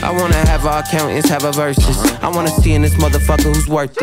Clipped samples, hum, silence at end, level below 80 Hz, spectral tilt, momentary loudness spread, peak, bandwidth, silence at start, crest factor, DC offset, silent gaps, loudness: under 0.1%; none; 0 s; -18 dBFS; -5 dB/octave; 3 LU; -2 dBFS; 16.5 kHz; 0 s; 10 dB; under 0.1%; none; -14 LUFS